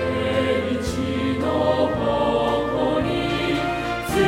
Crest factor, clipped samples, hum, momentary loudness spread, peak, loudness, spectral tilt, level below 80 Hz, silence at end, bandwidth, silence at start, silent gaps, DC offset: 16 dB; under 0.1%; none; 4 LU; -6 dBFS; -22 LUFS; -6 dB/octave; -40 dBFS; 0 s; 16 kHz; 0 s; none; under 0.1%